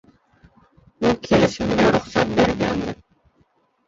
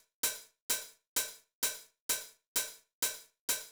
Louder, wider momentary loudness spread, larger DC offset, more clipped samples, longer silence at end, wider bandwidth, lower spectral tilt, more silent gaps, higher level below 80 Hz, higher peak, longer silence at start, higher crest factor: first, -20 LUFS vs -36 LUFS; about the same, 8 LU vs 6 LU; neither; neither; first, 0.95 s vs 0 s; second, 7.8 kHz vs over 20 kHz; first, -6 dB/octave vs 2 dB/octave; second, none vs 0.61-0.69 s, 1.07-1.16 s, 1.53-1.62 s, 2.00-2.09 s, 2.47-2.55 s, 2.93-3.02 s, 3.39-3.48 s; first, -44 dBFS vs -74 dBFS; first, -2 dBFS vs -16 dBFS; first, 1 s vs 0.25 s; about the same, 20 dB vs 24 dB